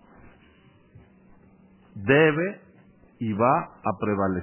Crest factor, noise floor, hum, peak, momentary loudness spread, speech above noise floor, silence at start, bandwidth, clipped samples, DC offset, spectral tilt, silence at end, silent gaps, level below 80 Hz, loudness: 20 dB; -56 dBFS; none; -6 dBFS; 15 LU; 33 dB; 1.95 s; 3.2 kHz; under 0.1%; under 0.1%; -10.5 dB/octave; 0 s; none; -56 dBFS; -24 LUFS